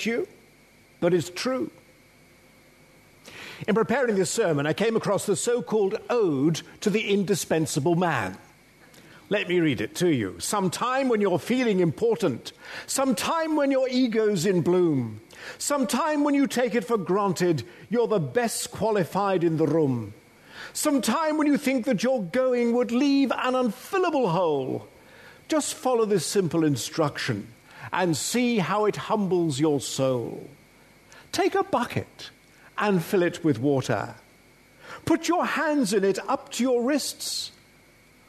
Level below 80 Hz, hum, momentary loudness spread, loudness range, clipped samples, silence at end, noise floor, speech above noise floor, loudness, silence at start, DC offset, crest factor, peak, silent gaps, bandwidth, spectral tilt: -66 dBFS; none; 9 LU; 3 LU; under 0.1%; 0.8 s; -56 dBFS; 32 dB; -25 LUFS; 0 s; under 0.1%; 16 dB; -8 dBFS; none; 13.5 kHz; -5 dB/octave